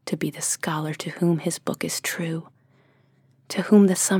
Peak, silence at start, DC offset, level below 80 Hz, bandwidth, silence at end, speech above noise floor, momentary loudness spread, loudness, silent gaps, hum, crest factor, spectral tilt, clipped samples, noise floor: -6 dBFS; 0.05 s; under 0.1%; -74 dBFS; 18.5 kHz; 0 s; 38 dB; 13 LU; -24 LUFS; none; none; 18 dB; -4.5 dB/octave; under 0.1%; -60 dBFS